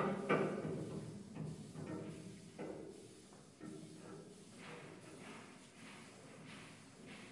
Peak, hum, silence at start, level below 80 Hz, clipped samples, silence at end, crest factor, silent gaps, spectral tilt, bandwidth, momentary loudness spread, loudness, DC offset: -22 dBFS; none; 0 s; -78 dBFS; under 0.1%; 0 s; 26 dB; none; -6 dB/octave; 11.5 kHz; 18 LU; -47 LUFS; under 0.1%